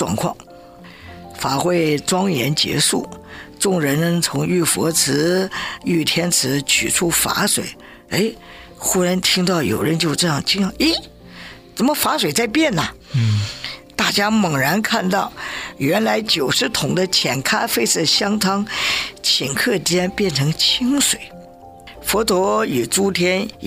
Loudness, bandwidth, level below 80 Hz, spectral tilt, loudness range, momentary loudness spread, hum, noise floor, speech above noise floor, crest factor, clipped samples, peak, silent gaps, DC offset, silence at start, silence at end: -18 LUFS; 16 kHz; -48 dBFS; -3.5 dB/octave; 2 LU; 9 LU; none; -40 dBFS; 22 dB; 16 dB; under 0.1%; -4 dBFS; none; under 0.1%; 0 s; 0 s